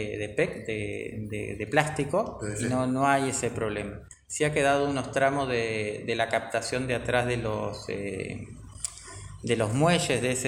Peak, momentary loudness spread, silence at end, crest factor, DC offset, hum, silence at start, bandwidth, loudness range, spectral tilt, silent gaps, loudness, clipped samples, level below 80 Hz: -4 dBFS; 12 LU; 0 s; 24 dB; under 0.1%; none; 0 s; 16 kHz; 3 LU; -4.5 dB/octave; none; -28 LUFS; under 0.1%; -52 dBFS